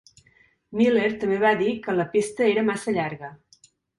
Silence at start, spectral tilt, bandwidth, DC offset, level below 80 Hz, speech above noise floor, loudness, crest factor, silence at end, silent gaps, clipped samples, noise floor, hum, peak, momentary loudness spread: 0.7 s; -5.5 dB/octave; 11.5 kHz; under 0.1%; -64 dBFS; 38 dB; -23 LUFS; 16 dB; 0.65 s; none; under 0.1%; -61 dBFS; none; -8 dBFS; 11 LU